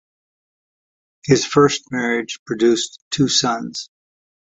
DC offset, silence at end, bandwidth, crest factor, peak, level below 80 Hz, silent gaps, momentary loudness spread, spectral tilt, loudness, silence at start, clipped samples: under 0.1%; 0.75 s; 8.4 kHz; 18 dB; -2 dBFS; -56 dBFS; 2.39-2.46 s, 3.02-3.11 s; 14 LU; -4 dB/octave; -18 LUFS; 1.25 s; under 0.1%